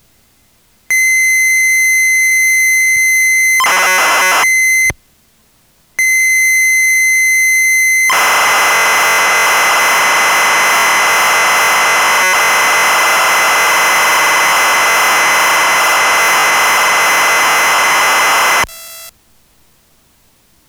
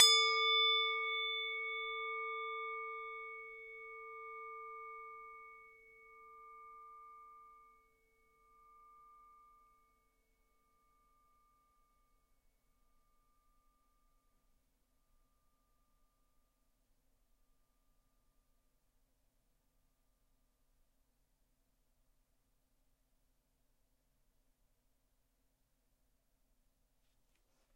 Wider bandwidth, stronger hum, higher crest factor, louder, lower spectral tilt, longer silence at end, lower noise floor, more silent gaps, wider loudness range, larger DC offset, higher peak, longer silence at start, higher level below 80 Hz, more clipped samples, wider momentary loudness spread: first, over 20 kHz vs 16 kHz; neither; second, 8 dB vs 32 dB; first, -8 LUFS vs -34 LUFS; first, 1 dB/octave vs 3.5 dB/octave; second, 1.6 s vs 20.2 s; second, -52 dBFS vs -79 dBFS; neither; second, 2 LU vs 24 LU; neither; first, -2 dBFS vs -12 dBFS; first, 0.9 s vs 0 s; first, -50 dBFS vs -78 dBFS; neither; second, 1 LU vs 27 LU